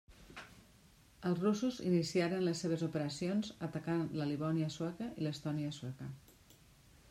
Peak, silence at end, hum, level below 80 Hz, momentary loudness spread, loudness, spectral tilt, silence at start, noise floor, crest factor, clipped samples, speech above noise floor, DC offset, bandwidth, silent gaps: -20 dBFS; 0.8 s; none; -68 dBFS; 17 LU; -37 LUFS; -6.5 dB/octave; 0.1 s; -64 dBFS; 18 dB; under 0.1%; 27 dB; under 0.1%; 14.5 kHz; none